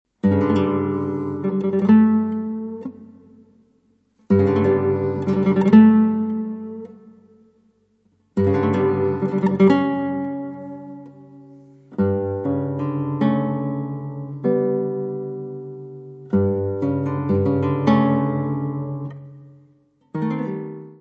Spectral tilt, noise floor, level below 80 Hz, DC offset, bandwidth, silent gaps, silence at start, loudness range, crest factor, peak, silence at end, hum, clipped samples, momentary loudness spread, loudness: -10 dB/octave; -62 dBFS; -62 dBFS; under 0.1%; 5.4 kHz; none; 0.25 s; 7 LU; 20 dB; -2 dBFS; 0.05 s; none; under 0.1%; 18 LU; -20 LUFS